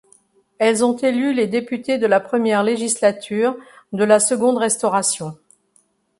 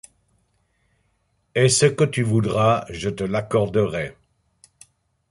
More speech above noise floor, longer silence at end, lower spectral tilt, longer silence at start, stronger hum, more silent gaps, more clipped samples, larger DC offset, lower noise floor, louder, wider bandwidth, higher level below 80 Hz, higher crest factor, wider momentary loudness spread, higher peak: second, 43 dB vs 48 dB; second, 0.85 s vs 1.2 s; second, -3.5 dB/octave vs -5 dB/octave; second, 0.6 s vs 1.55 s; neither; neither; neither; neither; second, -61 dBFS vs -68 dBFS; about the same, -18 LUFS vs -20 LUFS; about the same, 11.5 kHz vs 11.5 kHz; second, -66 dBFS vs -50 dBFS; about the same, 18 dB vs 20 dB; second, 7 LU vs 12 LU; about the same, -2 dBFS vs -4 dBFS